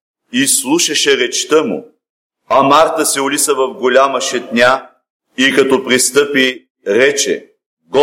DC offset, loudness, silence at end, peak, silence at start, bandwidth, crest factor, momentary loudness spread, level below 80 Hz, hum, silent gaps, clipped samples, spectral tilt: under 0.1%; -12 LUFS; 0 s; 0 dBFS; 0.35 s; 16.5 kHz; 14 dB; 8 LU; -58 dBFS; none; 2.10-2.30 s, 5.10-5.20 s, 6.70-6.75 s, 7.66-7.77 s; under 0.1%; -2 dB/octave